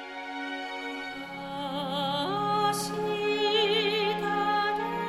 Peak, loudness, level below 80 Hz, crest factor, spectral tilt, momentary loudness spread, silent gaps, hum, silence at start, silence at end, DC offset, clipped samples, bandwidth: -14 dBFS; -29 LUFS; -64 dBFS; 16 dB; -4 dB/octave; 11 LU; none; none; 0 s; 0 s; under 0.1%; under 0.1%; 16 kHz